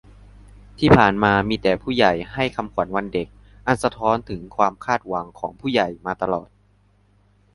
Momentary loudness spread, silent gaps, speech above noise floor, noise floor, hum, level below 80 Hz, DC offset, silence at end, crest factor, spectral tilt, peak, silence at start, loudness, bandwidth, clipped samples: 13 LU; none; 38 dB; -58 dBFS; 50 Hz at -45 dBFS; -42 dBFS; under 0.1%; 1.1 s; 22 dB; -6.5 dB/octave; 0 dBFS; 0.8 s; -21 LUFS; 11.5 kHz; under 0.1%